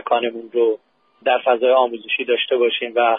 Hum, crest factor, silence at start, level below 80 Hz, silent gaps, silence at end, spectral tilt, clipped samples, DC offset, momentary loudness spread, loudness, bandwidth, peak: none; 16 dB; 0.05 s; -78 dBFS; none; 0 s; -7 dB/octave; under 0.1%; under 0.1%; 7 LU; -19 LUFS; 3.9 kHz; -2 dBFS